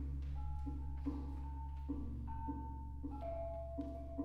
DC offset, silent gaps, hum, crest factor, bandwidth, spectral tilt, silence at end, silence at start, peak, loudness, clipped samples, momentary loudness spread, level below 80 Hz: under 0.1%; none; none; 14 dB; 4.6 kHz; -10.5 dB/octave; 0 s; 0 s; -30 dBFS; -46 LUFS; under 0.1%; 3 LU; -46 dBFS